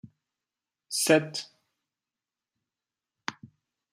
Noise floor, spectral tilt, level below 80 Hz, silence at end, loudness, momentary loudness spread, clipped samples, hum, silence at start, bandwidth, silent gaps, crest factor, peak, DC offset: under -90 dBFS; -3 dB/octave; -80 dBFS; 0.45 s; -26 LUFS; 17 LU; under 0.1%; none; 0.05 s; 15 kHz; none; 26 dB; -8 dBFS; under 0.1%